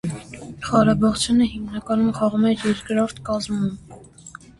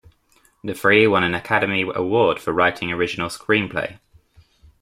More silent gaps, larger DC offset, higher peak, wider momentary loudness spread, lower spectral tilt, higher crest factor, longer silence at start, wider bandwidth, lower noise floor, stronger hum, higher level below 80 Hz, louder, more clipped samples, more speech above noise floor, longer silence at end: neither; neither; about the same, -2 dBFS vs -2 dBFS; first, 17 LU vs 12 LU; about the same, -5.5 dB/octave vs -5.5 dB/octave; about the same, 20 dB vs 18 dB; second, 0.05 s vs 0.65 s; second, 11.5 kHz vs 16 kHz; second, -43 dBFS vs -59 dBFS; neither; first, -46 dBFS vs -54 dBFS; about the same, -21 LUFS vs -19 LUFS; neither; second, 23 dB vs 40 dB; second, 0.3 s vs 0.85 s